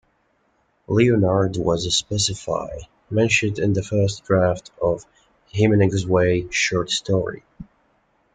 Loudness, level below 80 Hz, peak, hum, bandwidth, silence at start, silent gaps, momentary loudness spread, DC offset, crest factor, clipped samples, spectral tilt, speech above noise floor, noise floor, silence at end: -20 LUFS; -48 dBFS; -4 dBFS; none; 9.4 kHz; 0.9 s; none; 10 LU; under 0.1%; 18 dB; under 0.1%; -5 dB/octave; 45 dB; -65 dBFS; 0.7 s